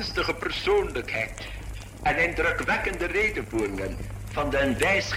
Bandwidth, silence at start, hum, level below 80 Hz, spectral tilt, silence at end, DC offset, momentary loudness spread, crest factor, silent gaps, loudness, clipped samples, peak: 16 kHz; 0 s; none; -38 dBFS; -4.5 dB/octave; 0 s; under 0.1%; 12 LU; 18 dB; none; -26 LUFS; under 0.1%; -8 dBFS